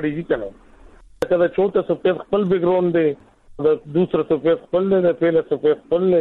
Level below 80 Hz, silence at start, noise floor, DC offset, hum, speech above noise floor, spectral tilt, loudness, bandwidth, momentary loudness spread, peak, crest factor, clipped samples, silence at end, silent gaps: -52 dBFS; 0 s; -46 dBFS; under 0.1%; none; 27 dB; -8.5 dB/octave; -19 LUFS; 6.8 kHz; 6 LU; -4 dBFS; 16 dB; under 0.1%; 0 s; none